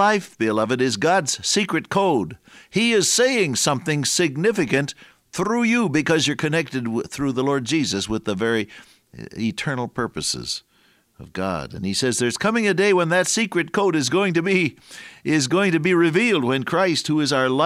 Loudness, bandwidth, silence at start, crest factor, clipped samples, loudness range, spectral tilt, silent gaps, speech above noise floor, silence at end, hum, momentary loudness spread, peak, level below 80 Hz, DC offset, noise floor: -20 LUFS; 16 kHz; 0 s; 16 dB; under 0.1%; 6 LU; -4 dB/octave; none; 39 dB; 0 s; none; 9 LU; -6 dBFS; -56 dBFS; under 0.1%; -60 dBFS